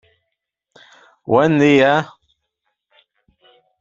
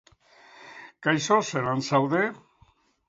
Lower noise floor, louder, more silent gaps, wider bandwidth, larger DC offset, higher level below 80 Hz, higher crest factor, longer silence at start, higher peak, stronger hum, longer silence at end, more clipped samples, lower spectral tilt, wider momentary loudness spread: first, -77 dBFS vs -62 dBFS; first, -14 LUFS vs -25 LUFS; neither; about the same, 7.6 kHz vs 7.8 kHz; neither; first, -60 dBFS vs -66 dBFS; about the same, 18 dB vs 20 dB; first, 1.3 s vs 0.6 s; first, -2 dBFS vs -8 dBFS; neither; first, 1.75 s vs 0.7 s; neither; first, -6.5 dB/octave vs -5 dB/octave; about the same, 20 LU vs 22 LU